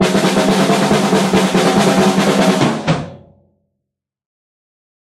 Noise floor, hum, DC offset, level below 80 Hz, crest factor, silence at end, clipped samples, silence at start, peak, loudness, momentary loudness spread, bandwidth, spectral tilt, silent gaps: -78 dBFS; none; under 0.1%; -46 dBFS; 14 dB; 2 s; under 0.1%; 0 s; 0 dBFS; -13 LUFS; 6 LU; 15 kHz; -5 dB/octave; none